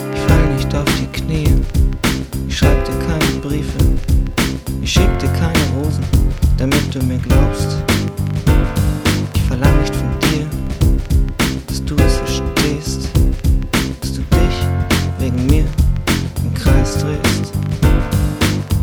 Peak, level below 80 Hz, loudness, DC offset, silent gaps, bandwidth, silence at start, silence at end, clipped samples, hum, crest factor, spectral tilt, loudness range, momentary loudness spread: 0 dBFS; -18 dBFS; -16 LUFS; under 0.1%; none; over 20 kHz; 0 s; 0 s; under 0.1%; none; 14 dB; -5.5 dB/octave; 1 LU; 4 LU